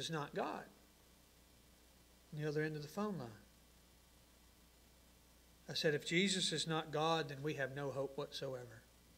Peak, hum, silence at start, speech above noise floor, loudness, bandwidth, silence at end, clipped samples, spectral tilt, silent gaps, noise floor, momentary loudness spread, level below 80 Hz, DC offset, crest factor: -22 dBFS; none; 0 s; 26 dB; -40 LUFS; 16 kHz; 0.35 s; under 0.1%; -4 dB/octave; none; -67 dBFS; 18 LU; -72 dBFS; under 0.1%; 22 dB